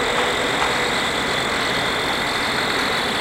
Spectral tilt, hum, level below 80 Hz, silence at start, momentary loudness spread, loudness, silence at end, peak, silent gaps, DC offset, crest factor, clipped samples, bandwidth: -2.5 dB/octave; none; -44 dBFS; 0 s; 1 LU; -19 LUFS; 0 s; -6 dBFS; none; under 0.1%; 14 dB; under 0.1%; 16 kHz